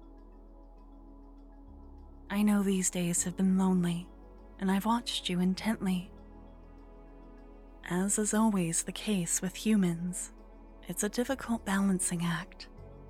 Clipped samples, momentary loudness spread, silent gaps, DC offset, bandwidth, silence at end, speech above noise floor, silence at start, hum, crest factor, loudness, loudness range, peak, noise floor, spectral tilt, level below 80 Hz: under 0.1%; 12 LU; none; under 0.1%; 16 kHz; 0 s; 22 dB; 0 s; none; 16 dB; -31 LUFS; 4 LU; -16 dBFS; -52 dBFS; -4.5 dB/octave; -52 dBFS